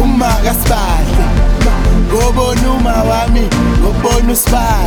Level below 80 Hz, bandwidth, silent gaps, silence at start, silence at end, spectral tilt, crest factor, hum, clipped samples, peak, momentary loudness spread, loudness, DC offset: -12 dBFS; over 20 kHz; none; 0 s; 0 s; -5 dB/octave; 10 dB; none; under 0.1%; 0 dBFS; 2 LU; -12 LUFS; under 0.1%